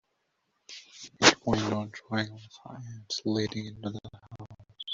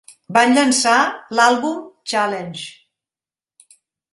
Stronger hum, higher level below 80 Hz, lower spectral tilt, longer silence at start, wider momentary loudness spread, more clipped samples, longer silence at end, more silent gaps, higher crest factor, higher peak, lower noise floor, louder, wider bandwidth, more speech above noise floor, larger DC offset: neither; first, -60 dBFS vs -68 dBFS; about the same, -3.5 dB/octave vs -2.5 dB/octave; first, 0.7 s vs 0.3 s; first, 26 LU vs 16 LU; neither; second, 0 s vs 1.45 s; neither; first, 30 dB vs 18 dB; about the same, -2 dBFS vs 0 dBFS; second, -77 dBFS vs under -90 dBFS; second, -28 LUFS vs -16 LUFS; second, 8.2 kHz vs 11.5 kHz; second, 44 dB vs over 73 dB; neither